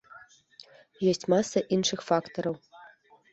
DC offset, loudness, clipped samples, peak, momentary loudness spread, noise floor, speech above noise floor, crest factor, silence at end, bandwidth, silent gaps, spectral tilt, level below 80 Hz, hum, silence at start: under 0.1%; -28 LUFS; under 0.1%; -10 dBFS; 8 LU; -56 dBFS; 29 dB; 20 dB; 0.45 s; 8.2 kHz; none; -4.5 dB/octave; -68 dBFS; none; 0.15 s